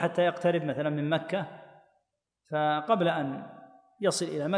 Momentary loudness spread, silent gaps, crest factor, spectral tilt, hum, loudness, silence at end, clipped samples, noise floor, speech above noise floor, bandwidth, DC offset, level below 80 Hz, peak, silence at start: 10 LU; none; 18 dB; -5 dB/octave; none; -29 LUFS; 0 s; under 0.1%; -78 dBFS; 50 dB; 10.5 kHz; under 0.1%; -78 dBFS; -12 dBFS; 0 s